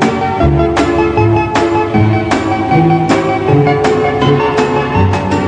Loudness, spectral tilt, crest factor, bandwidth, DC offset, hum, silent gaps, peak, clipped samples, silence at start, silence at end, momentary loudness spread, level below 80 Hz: -11 LUFS; -7 dB/octave; 10 dB; 10 kHz; 0.1%; none; none; 0 dBFS; under 0.1%; 0 s; 0 s; 2 LU; -28 dBFS